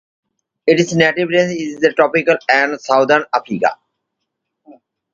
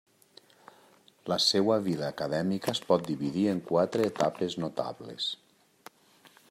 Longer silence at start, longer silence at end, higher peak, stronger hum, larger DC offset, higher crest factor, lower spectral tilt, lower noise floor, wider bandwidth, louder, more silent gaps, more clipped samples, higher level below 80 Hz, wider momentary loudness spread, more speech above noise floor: second, 0.65 s vs 1.25 s; first, 0.4 s vs 0.25 s; first, 0 dBFS vs -10 dBFS; neither; neither; about the same, 16 dB vs 20 dB; about the same, -5 dB/octave vs -5 dB/octave; first, -76 dBFS vs -61 dBFS; second, 7.8 kHz vs 16 kHz; first, -15 LUFS vs -29 LUFS; neither; neither; first, -62 dBFS vs -72 dBFS; second, 6 LU vs 9 LU; first, 61 dB vs 32 dB